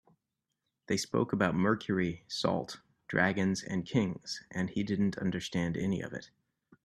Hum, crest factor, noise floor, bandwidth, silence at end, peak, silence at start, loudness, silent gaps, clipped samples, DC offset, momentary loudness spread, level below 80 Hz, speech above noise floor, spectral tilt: none; 22 dB; -86 dBFS; 12.5 kHz; 0.6 s; -12 dBFS; 0.9 s; -32 LUFS; none; under 0.1%; under 0.1%; 9 LU; -64 dBFS; 54 dB; -5.5 dB/octave